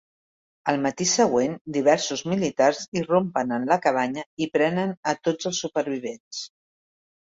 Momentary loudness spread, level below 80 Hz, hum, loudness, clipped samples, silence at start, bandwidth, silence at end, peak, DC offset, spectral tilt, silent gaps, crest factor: 10 LU; -66 dBFS; none; -24 LUFS; under 0.1%; 0.65 s; 8 kHz; 0.75 s; -6 dBFS; under 0.1%; -4 dB/octave; 1.61-1.65 s, 2.88-2.92 s, 4.26-4.37 s, 4.97-5.03 s, 6.20-6.31 s; 20 dB